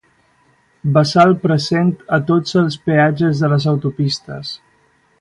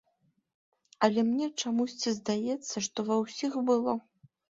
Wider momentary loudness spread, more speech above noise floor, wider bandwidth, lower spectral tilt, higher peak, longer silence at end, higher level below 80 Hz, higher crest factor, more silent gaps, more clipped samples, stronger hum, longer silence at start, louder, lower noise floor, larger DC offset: first, 13 LU vs 6 LU; about the same, 42 dB vs 44 dB; first, 11 kHz vs 7.8 kHz; first, -7 dB/octave vs -4 dB/octave; first, 0 dBFS vs -10 dBFS; first, 0.65 s vs 0.5 s; first, -54 dBFS vs -74 dBFS; second, 16 dB vs 22 dB; neither; neither; neither; second, 0.85 s vs 1 s; first, -15 LUFS vs -30 LUFS; second, -57 dBFS vs -74 dBFS; neither